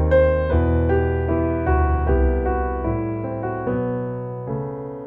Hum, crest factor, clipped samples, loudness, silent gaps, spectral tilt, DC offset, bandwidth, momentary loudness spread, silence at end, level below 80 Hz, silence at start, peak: none; 14 dB; under 0.1%; -22 LUFS; none; -11.5 dB/octave; under 0.1%; 4 kHz; 9 LU; 0 s; -26 dBFS; 0 s; -6 dBFS